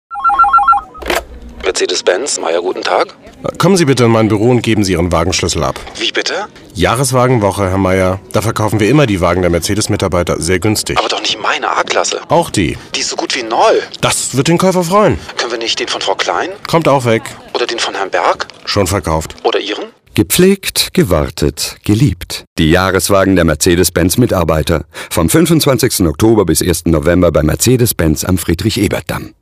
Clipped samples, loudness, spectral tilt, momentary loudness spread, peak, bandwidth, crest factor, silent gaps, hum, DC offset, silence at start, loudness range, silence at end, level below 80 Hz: 0.2%; -12 LUFS; -4.5 dB/octave; 8 LU; 0 dBFS; 16 kHz; 12 dB; 22.47-22.56 s; none; under 0.1%; 0.1 s; 3 LU; 0.1 s; -32 dBFS